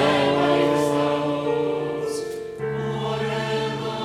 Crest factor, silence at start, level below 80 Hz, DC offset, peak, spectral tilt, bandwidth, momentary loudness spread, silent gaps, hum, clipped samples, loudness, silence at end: 16 dB; 0 s; -56 dBFS; under 0.1%; -6 dBFS; -5.5 dB/octave; 15 kHz; 9 LU; none; none; under 0.1%; -23 LUFS; 0 s